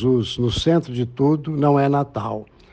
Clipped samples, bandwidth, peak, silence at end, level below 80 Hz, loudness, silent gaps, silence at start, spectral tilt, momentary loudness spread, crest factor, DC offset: under 0.1%; 9 kHz; -6 dBFS; 0.3 s; -44 dBFS; -20 LUFS; none; 0 s; -7 dB/octave; 10 LU; 14 dB; under 0.1%